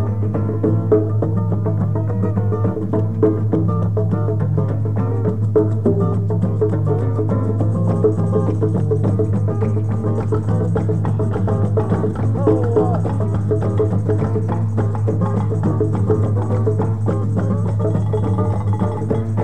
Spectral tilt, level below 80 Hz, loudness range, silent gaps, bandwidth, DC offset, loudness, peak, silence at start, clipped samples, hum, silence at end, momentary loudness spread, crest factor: -10.5 dB/octave; -40 dBFS; 1 LU; none; 3.4 kHz; 2%; -18 LUFS; -2 dBFS; 0 s; under 0.1%; none; 0 s; 3 LU; 14 dB